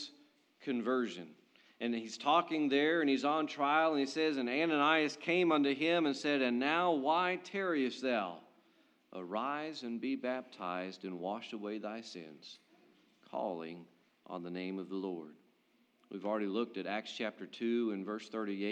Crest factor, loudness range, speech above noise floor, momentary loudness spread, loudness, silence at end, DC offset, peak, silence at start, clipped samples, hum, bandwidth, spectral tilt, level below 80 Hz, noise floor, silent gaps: 20 dB; 13 LU; 38 dB; 17 LU; -35 LUFS; 0 s; under 0.1%; -14 dBFS; 0 s; under 0.1%; none; 9.4 kHz; -5 dB/octave; under -90 dBFS; -73 dBFS; none